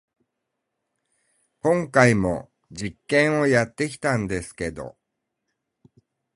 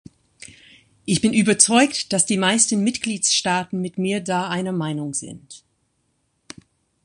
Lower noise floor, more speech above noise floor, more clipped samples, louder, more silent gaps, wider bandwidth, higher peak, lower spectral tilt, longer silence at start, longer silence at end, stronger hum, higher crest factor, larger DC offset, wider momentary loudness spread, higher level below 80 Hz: first, -80 dBFS vs -69 dBFS; first, 58 dB vs 49 dB; neither; second, -22 LUFS vs -19 LUFS; neither; about the same, 11.5 kHz vs 11.5 kHz; about the same, -2 dBFS vs 0 dBFS; first, -6 dB/octave vs -3 dB/octave; first, 1.65 s vs 1.05 s; about the same, 1.45 s vs 1.45 s; neither; about the same, 24 dB vs 22 dB; neither; first, 16 LU vs 13 LU; first, -50 dBFS vs -60 dBFS